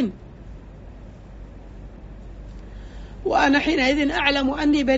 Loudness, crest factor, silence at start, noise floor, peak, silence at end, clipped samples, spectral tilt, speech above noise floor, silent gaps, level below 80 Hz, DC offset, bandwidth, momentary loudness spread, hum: -20 LUFS; 20 dB; 0 s; -40 dBFS; -4 dBFS; 0 s; under 0.1%; -2.5 dB/octave; 21 dB; none; -40 dBFS; under 0.1%; 8 kHz; 25 LU; none